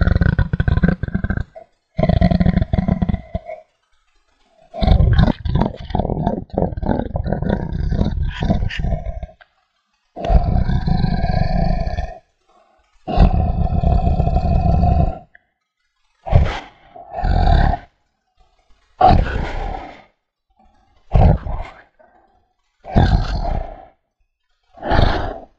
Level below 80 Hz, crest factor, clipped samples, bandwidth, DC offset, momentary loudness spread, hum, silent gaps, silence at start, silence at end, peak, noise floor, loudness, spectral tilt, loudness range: -22 dBFS; 18 dB; under 0.1%; 6.8 kHz; under 0.1%; 15 LU; none; none; 0 s; 0.15 s; 0 dBFS; -70 dBFS; -19 LUFS; -9 dB/octave; 4 LU